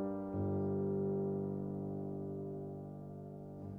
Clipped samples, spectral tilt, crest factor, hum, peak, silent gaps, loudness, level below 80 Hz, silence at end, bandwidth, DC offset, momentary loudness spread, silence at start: under 0.1%; -12.5 dB/octave; 12 dB; none; -28 dBFS; none; -40 LUFS; -66 dBFS; 0 s; 2.2 kHz; under 0.1%; 12 LU; 0 s